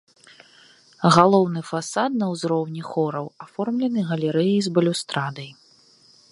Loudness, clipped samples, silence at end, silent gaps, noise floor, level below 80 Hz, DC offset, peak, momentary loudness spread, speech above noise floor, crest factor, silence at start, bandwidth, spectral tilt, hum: -22 LUFS; under 0.1%; 0.8 s; none; -55 dBFS; -68 dBFS; under 0.1%; 0 dBFS; 14 LU; 34 dB; 22 dB; 1 s; 11.5 kHz; -6 dB/octave; none